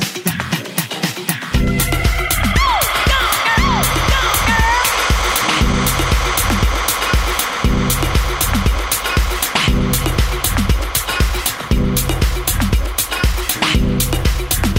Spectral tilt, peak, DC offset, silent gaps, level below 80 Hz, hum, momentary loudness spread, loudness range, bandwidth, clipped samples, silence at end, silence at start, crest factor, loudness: -3.5 dB/octave; 0 dBFS; under 0.1%; none; -20 dBFS; none; 5 LU; 3 LU; 16.5 kHz; under 0.1%; 0 s; 0 s; 16 dB; -16 LUFS